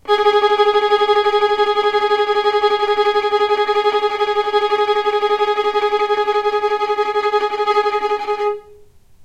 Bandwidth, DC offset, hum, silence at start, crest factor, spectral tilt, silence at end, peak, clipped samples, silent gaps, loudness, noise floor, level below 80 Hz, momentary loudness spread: 8.8 kHz; under 0.1%; none; 0.05 s; 14 dB; -2.5 dB/octave; 0 s; -2 dBFS; under 0.1%; none; -16 LUFS; -44 dBFS; -54 dBFS; 4 LU